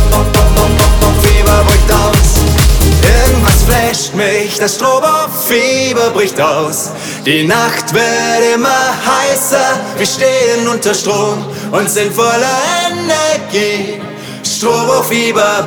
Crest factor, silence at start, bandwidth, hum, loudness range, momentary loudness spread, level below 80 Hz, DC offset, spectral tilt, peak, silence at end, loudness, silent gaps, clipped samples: 10 dB; 0 s; over 20 kHz; none; 4 LU; 6 LU; -16 dBFS; under 0.1%; -4 dB/octave; 0 dBFS; 0 s; -11 LUFS; none; under 0.1%